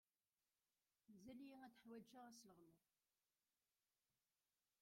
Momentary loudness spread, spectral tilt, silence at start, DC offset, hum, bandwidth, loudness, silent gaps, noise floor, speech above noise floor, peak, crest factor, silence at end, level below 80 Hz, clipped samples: 5 LU; -4.5 dB/octave; 1.1 s; under 0.1%; none; 16 kHz; -64 LUFS; none; under -90 dBFS; over 25 dB; -50 dBFS; 18 dB; 2.05 s; under -90 dBFS; under 0.1%